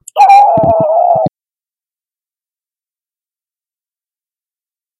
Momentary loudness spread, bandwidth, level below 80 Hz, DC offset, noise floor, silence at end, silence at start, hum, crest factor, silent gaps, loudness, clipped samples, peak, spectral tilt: 8 LU; 12 kHz; -50 dBFS; under 0.1%; under -90 dBFS; 3.7 s; 0.15 s; none; 14 dB; none; -8 LUFS; 0.8%; 0 dBFS; -6 dB/octave